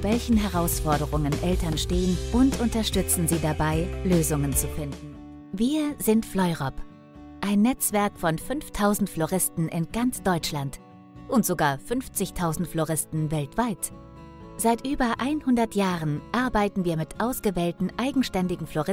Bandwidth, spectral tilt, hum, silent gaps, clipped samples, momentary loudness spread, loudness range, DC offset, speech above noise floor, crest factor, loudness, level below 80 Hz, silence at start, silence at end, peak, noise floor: 16.5 kHz; -5 dB/octave; none; none; under 0.1%; 10 LU; 3 LU; under 0.1%; 20 dB; 18 dB; -25 LUFS; -38 dBFS; 0 s; 0 s; -8 dBFS; -45 dBFS